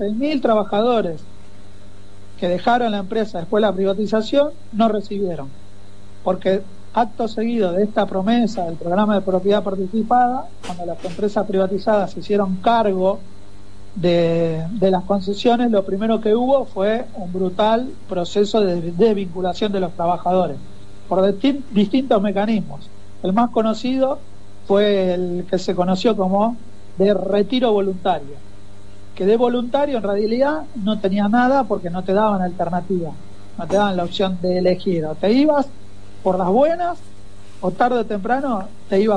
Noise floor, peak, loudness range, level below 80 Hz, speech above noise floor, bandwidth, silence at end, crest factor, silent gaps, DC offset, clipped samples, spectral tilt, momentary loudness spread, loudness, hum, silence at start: -44 dBFS; -4 dBFS; 2 LU; -48 dBFS; 25 dB; 10.5 kHz; 0 s; 14 dB; none; 4%; under 0.1%; -7 dB/octave; 9 LU; -19 LUFS; 50 Hz at -45 dBFS; 0 s